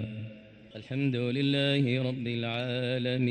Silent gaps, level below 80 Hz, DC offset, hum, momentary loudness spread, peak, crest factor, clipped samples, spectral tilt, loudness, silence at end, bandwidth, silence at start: none; -68 dBFS; under 0.1%; none; 17 LU; -14 dBFS; 16 dB; under 0.1%; -7.5 dB/octave; -30 LUFS; 0 s; 9 kHz; 0 s